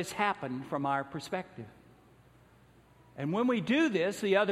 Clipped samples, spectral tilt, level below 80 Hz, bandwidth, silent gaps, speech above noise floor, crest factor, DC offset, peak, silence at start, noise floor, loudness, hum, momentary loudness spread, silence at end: under 0.1%; -5.5 dB/octave; -70 dBFS; 15 kHz; none; 30 dB; 20 dB; under 0.1%; -14 dBFS; 0 s; -61 dBFS; -31 LUFS; none; 19 LU; 0 s